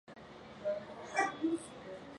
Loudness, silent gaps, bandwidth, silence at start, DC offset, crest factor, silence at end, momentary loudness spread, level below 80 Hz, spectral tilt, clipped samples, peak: -38 LUFS; none; 11.5 kHz; 0.05 s; under 0.1%; 22 dB; 0 s; 18 LU; -72 dBFS; -4 dB/octave; under 0.1%; -18 dBFS